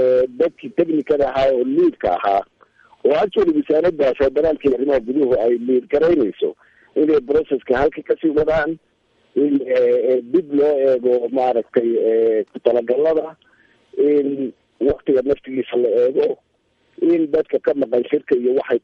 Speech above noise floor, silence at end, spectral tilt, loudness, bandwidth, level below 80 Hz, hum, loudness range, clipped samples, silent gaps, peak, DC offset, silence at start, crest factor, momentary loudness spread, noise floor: 45 dB; 0.05 s; -8 dB/octave; -18 LUFS; 6.2 kHz; -48 dBFS; none; 2 LU; under 0.1%; none; 0 dBFS; under 0.1%; 0 s; 16 dB; 6 LU; -62 dBFS